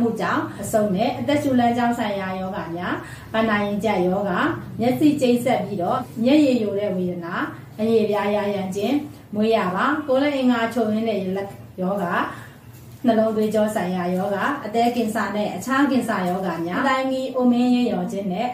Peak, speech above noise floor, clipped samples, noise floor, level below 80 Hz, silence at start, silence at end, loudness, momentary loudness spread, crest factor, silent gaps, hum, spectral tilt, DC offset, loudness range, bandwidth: -6 dBFS; 21 dB; under 0.1%; -42 dBFS; -56 dBFS; 0 s; 0 s; -22 LUFS; 8 LU; 16 dB; none; none; -6 dB/octave; under 0.1%; 3 LU; 16 kHz